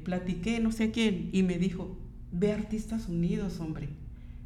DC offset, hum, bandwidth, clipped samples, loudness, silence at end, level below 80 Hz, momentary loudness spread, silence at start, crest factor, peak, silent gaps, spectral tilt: under 0.1%; none; 13 kHz; under 0.1%; -31 LUFS; 0 s; -44 dBFS; 14 LU; 0 s; 16 dB; -14 dBFS; none; -6.5 dB/octave